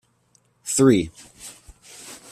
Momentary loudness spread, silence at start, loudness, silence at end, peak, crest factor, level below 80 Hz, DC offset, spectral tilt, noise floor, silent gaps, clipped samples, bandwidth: 24 LU; 0.65 s; -20 LUFS; 0.15 s; -4 dBFS; 20 dB; -54 dBFS; under 0.1%; -5 dB/octave; -63 dBFS; none; under 0.1%; 14.5 kHz